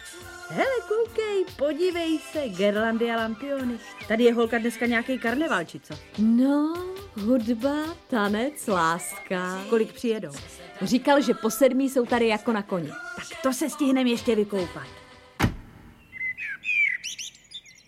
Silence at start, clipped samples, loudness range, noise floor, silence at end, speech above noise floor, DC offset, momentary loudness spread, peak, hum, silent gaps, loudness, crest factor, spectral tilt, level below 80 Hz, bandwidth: 0 s; under 0.1%; 3 LU; -49 dBFS; 0.15 s; 24 dB; under 0.1%; 14 LU; -6 dBFS; none; none; -25 LUFS; 20 dB; -4.5 dB/octave; -52 dBFS; 16 kHz